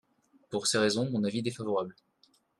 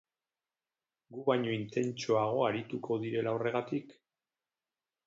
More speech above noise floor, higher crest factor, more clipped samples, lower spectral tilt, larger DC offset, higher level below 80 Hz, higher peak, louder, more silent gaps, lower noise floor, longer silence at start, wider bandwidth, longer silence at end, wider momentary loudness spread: second, 38 dB vs over 57 dB; about the same, 20 dB vs 20 dB; neither; second, -4 dB/octave vs -6 dB/octave; neither; about the same, -72 dBFS vs -76 dBFS; about the same, -12 dBFS vs -14 dBFS; first, -30 LUFS vs -33 LUFS; neither; second, -68 dBFS vs under -90 dBFS; second, 0.5 s vs 1.1 s; first, 12.5 kHz vs 7.8 kHz; second, 0.7 s vs 1.15 s; about the same, 9 LU vs 7 LU